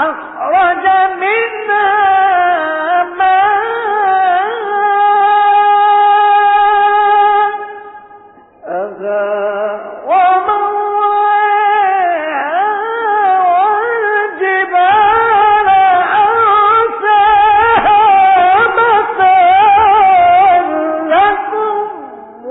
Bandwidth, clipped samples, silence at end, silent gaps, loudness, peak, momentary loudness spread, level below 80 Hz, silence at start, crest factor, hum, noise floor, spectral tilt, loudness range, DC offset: 4 kHz; under 0.1%; 0 s; none; -10 LUFS; 0 dBFS; 9 LU; -48 dBFS; 0 s; 10 dB; none; -40 dBFS; -9 dB/octave; 5 LU; under 0.1%